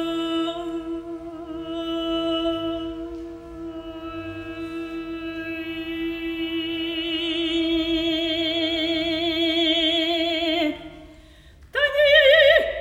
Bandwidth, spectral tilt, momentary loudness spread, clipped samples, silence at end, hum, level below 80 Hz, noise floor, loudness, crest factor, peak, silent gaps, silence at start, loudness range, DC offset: 15 kHz; -4 dB/octave; 18 LU; under 0.1%; 0 s; none; -48 dBFS; -48 dBFS; -22 LUFS; 20 dB; -4 dBFS; none; 0 s; 11 LU; under 0.1%